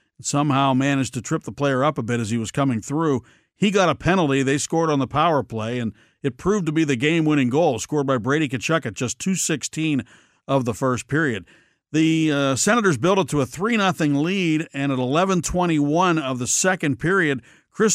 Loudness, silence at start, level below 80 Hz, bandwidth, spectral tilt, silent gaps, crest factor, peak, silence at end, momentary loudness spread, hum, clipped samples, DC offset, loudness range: -21 LUFS; 0.2 s; -50 dBFS; 15.5 kHz; -5 dB/octave; none; 16 dB; -4 dBFS; 0 s; 6 LU; none; under 0.1%; under 0.1%; 3 LU